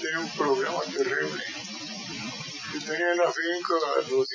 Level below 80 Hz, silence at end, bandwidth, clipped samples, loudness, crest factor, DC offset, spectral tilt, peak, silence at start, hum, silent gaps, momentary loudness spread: -74 dBFS; 0 s; 7.6 kHz; under 0.1%; -28 LUFS; 18 dB; under 0.1%; -3 dB/octave; -12 dBFS; 0 s; none; none; 10 LU